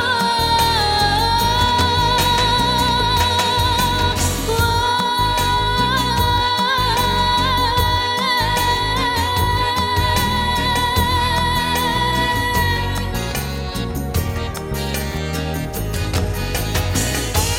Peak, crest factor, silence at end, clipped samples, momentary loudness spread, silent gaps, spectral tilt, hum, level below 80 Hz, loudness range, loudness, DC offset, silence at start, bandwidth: -4 dBFS; 14 dB; 0 s; under 0.1%; 8 LU; none; -3.5 dB/octave; none; -28 dBFS; 6 LU; -17 LUFS; under 0.1%; 0 s; 16.5 kHz